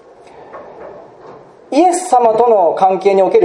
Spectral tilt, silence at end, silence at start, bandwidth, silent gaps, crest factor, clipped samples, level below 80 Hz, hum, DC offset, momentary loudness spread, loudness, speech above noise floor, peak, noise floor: -5 dB/octave; 0 s; 0.5 s; 11.5 kHz; none; 14 dB; under 0.1%; -62 dBFS; none; under 0.1%; 23 LU; -12 LUFS; 28 dB; 0 dBFS; -39 dBFS